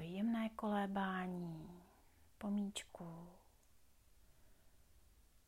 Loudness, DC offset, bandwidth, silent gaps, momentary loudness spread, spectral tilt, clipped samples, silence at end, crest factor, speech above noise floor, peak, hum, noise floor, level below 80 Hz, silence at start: -43 LUFS; under 0.1%; 15.5 kHz; none; 17 LU; -6 dB/octave; under 0.1%; 0.5 s; 16 dB; 27 dB; -30 dBFS; none; -71 dBFS; -72 dBFS; 0 s